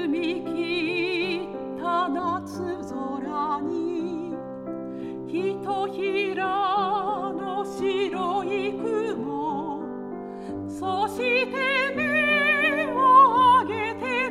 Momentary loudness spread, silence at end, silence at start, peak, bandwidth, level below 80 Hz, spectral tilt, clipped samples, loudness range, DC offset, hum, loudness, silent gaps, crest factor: 15 LU; 0 s; 0 s; -6 dBFS; 13.5 kHz; -62 dBFS; -5 dB/octave; under 0.1%; 9 LU; under 0.1%; none; -24 LUFS; none; 20 dB